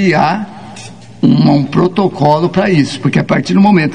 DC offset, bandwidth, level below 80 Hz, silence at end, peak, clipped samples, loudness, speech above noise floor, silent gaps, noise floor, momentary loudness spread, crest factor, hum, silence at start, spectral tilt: 0.9%; 10 kHz; -48 dBFS; 0 s; 0 dBFS; 0.4%; -11 LUFS; 21 dB; none; -32 dBFS; 19 LU; 12 dB; none; 0 s; -7 dB/octave